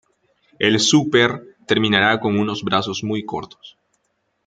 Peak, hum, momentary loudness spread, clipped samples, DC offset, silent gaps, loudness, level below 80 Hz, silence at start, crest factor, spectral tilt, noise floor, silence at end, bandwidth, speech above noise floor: 0 dBFS; none; 15 LU; under 0.1%; under 0.1%; none; -18 LUFS; -58 dBFS; 0.6 s; 20 dB; -4 dB/octave; -70 dBFS; 0.75 s; 9.4 kHz; 52 dB